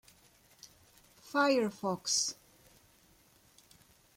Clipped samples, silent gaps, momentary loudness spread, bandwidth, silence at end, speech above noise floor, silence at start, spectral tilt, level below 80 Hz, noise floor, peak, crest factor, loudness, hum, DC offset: under 0.1%; none; 27 LU; 16.5 kHz; 1.85 s; 34 dB; 0.65 s; -2.5 dB/octave; -74 dBFS; -65 dBFS; -16 dBFS; 22 dB; -31 LUFS; none; under 0.1%